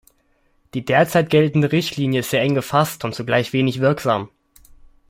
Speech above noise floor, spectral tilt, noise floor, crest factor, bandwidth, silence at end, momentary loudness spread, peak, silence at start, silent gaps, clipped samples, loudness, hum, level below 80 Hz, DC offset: 43 dB; -6 dB/octave; -62 dBFS; 18 dB; 16.5 kHz; 0.8 s; 9 LU; -2 dBFS; 0.75 s; none; under 0.1%; -19 LUFS; none; -54 dBFS; under 0.1%